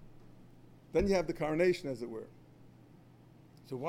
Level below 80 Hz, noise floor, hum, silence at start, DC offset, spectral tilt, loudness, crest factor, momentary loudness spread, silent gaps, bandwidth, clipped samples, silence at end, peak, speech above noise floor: -54 dBFS; -59 dBFS; none; 0 s; under 0.1%; -6.5 dB/octave; -33 LUFS; 20 dB; 16 LU; none; 15.5 kHz; under 0.1%; 0 s; -18 dBFS; 26 dB